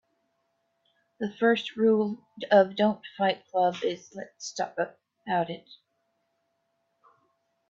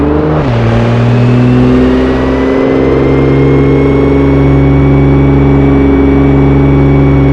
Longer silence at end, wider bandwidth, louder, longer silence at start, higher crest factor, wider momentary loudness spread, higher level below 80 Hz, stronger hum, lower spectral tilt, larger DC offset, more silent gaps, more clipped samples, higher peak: first, 1.95 s vs 0 s; first, 7.8 kHz vs 6.6 kHz; second, -27 LUFS vs -7 LUFS; first, 1.2 s vs 0 s; first, 20 dB vs 6 dB; first, 16 LU vs 3 LU; second, -78 dBFS vs -16 dBFS; neither; second, -5 dB/octave vs -9.5 dB/octave; neither; neither; second, under 0.1% vs 4%; second, -8 dBFS vs 0 dBFS